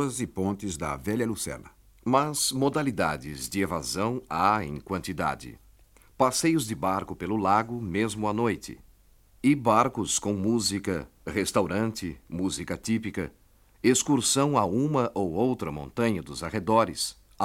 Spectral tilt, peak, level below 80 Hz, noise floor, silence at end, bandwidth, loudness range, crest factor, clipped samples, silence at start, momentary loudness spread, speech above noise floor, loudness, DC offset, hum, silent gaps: -4.5 dB/octave; -8 dBFS; -54 dBFS; -58 dBFS; 0 s; 17 kHz; 3 LU; 20 dB; under 0.1%; 0 s; 10 LU; 31 dB; -27 LUFS; under 0.1%; none; none